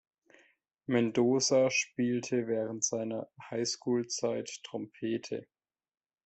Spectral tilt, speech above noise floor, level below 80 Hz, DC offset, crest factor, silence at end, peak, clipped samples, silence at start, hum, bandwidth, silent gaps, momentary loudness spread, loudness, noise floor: -4 dB/octave; over 59 dB; -76 dBFS; under 0.1%; 18 dB; 0.8 s; -16 dBFS; under 0.1%; 0.9 s; none; 8.4 kHz; none; 14 LU; -32 LUFS; under -90 dBFS